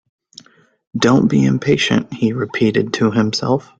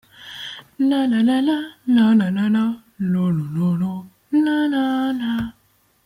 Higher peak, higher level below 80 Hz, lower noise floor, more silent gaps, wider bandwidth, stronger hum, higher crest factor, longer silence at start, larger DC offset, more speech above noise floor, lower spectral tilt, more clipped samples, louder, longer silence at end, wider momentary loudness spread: first, -2 dBFS vs -6 dBFS; first, -50 dBFS vs -56 dBFS; second, -45 dBFS vs -60 dBFS; neither; second, 9 kHz vs 15 kHz; neither; about the same, 16 dB vs 14 dB; first, 0.95 s vs 0.2 s; neither; second, 29 dB vs 42 dB; second, -6 dB/octave vs -7.5 dB/octave; neither; first, -16 LUFS vs -20 LUFS; second, 0.2 s vs 0.55 s; second, 6 LU vs 15 LU